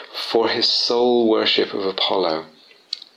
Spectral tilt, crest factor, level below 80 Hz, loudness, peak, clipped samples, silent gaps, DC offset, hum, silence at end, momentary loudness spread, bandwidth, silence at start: -3.5 dB/octave; 14 dB; -70 dBFS; -18 LUFS; -6 dBFS; under 0.1%; none; under 0.1%; none; 0.15 s; 9 LU; 14 kHz; 0 s